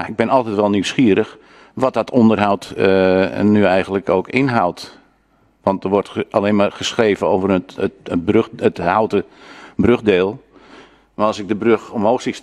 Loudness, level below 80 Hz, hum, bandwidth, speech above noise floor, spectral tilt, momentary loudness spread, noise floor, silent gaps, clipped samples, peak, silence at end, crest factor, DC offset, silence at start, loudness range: -17 LUFS; -50 dBFS; none; 11.5 kHz; 41 dB; -6 dB/octave; 8 LU; -57 dBFS; none; under 0.1%; 0 dBFS; 0.05 s; 16 dB; under 0.1%; 0 s; 3 LU